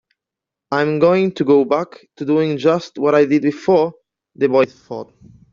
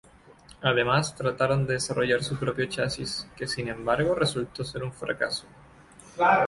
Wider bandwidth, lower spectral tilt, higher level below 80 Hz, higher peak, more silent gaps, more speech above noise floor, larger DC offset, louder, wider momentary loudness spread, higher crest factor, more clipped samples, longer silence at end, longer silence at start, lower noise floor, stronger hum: second, 7.4 kHz vs 11.5 kHz; about the same, -5.5 dB/octave vs -4.5 dB/octave; second, -60 dBFS vs -54 dBFS; first, -2 dBFS vs -8 dBFS; neither; first, 69 dB vs 26 dB; neither; first, -16 LUFS vs -27 LUFS; about the same, 12 LU vs 10 LU; second, 14 dB vs 20 dB; neither; first, 0.5 s vs 0 s; first, 0.7 s vs 0.5 s; first, -85 dBFS vs -53 dBFS; neither